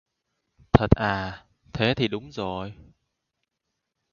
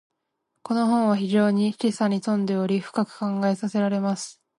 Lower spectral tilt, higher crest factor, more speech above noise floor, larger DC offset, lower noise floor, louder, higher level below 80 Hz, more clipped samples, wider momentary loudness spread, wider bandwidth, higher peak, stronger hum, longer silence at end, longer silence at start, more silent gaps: about the same, -7.5 dB/octave vs -6.5 dB/octave; first, 28 dB vs 14 dB; about the same, 56 dB vs 55 dB; neither; about the same, -81 dBFS vs -78 dBFS; about the same, -25 LUFS vs -24 LUFS; first, -40 dBFS vs -72 dBFS; neither; first, 18 LU vs 6 LU; second, 7 kHz vs 11.5 kHz; first, 0 dBFS vs -10 dBFS; neither; first, 1.4 s vs 0.25 s; about the same, 0.75 s vs 0.65 s; neither